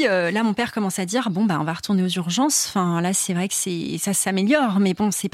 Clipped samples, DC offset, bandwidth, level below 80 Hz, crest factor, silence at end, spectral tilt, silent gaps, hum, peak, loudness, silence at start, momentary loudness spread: under 0.1%; under 0.1%; 16 kHz; -62 dBFS; 14 dB; 0.05 s; -4 dB/octave; none; none; -6 dBFS; -21 LUFS; 0 s; 5 LU